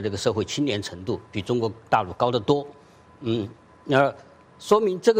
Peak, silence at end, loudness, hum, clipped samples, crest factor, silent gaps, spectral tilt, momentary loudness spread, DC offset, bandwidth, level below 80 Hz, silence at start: -6 dBFS; 0 s; -24 LUFS; none; under 0.1%; 18 dB; none; -5.5 dB/octave; 12 LU; under 0.1%; 16 kHz; -60 dBFS; 0 s